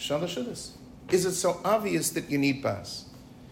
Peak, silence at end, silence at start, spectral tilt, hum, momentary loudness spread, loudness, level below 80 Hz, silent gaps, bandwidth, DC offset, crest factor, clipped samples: -12 dBFS; 0 s; 0 s; -4 dB/octave; none; 15 LU; -28 LUFS; -58 dBFS; none; 16.5 kHz; under 0.1%; 18 dB; under 0.1%